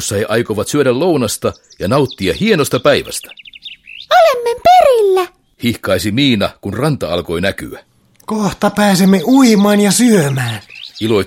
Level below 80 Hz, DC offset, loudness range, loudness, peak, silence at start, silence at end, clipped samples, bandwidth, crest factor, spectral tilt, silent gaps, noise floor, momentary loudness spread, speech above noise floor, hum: -44 dBFS; under 0.1%; 4 LU; -13 LUFS; 0 dBFS; 0 s; 0 s; under 0.1%; 16.5 kHz; 14 dB; -5 dB/octave; none; -34 dBFS; 16 LU; 21 dB; none